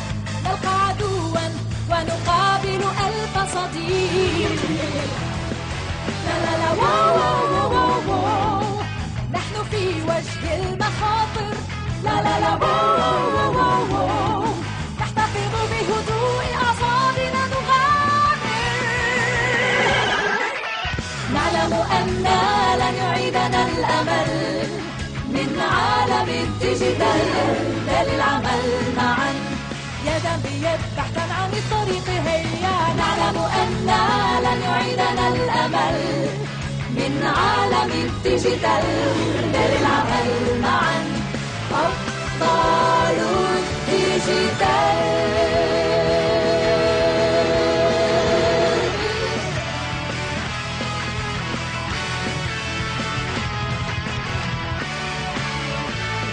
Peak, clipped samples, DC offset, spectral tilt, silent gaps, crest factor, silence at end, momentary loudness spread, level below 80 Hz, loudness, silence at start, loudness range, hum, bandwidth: -6 dBFS; under 0.1%; under 0.1%; -5 dB/octave; none; 14 dB; 0 s; 7 LU; -40 dBFS; -20 LUFS; 0 s; 5 LU; none; 10 kHz